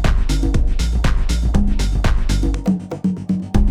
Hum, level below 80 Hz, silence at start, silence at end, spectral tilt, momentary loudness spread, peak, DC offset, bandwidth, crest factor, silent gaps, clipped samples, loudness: none; -18 dBFS; 0 s; 0 s; -6 dB/octave; 2 LU; -2 dBFS; under 0.1%; 13 kHz; 14 dB; none; under 0.1%; -20 LUFS